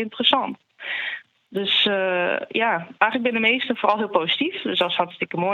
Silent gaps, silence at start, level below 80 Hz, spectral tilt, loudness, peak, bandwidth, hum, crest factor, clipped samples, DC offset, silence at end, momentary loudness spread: none; 0 s; -76 dBFS; -5.5 dB/octave; -21 LUFS; -2 dBFS; 12.5 kHz; none; 22 dB; under 0.1%; under 0.1%; 0 s; 10 LU